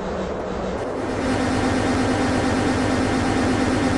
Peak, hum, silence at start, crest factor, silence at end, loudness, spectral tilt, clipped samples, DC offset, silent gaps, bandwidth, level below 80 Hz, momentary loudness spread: -8 dBFS; none; 0 s; 14 dB; 0 s; -22 LUFS; -5.5 dB/octave; under 0.1%; under 0.1%; none; 11.5 kHz; -36 dBFS; 6 LU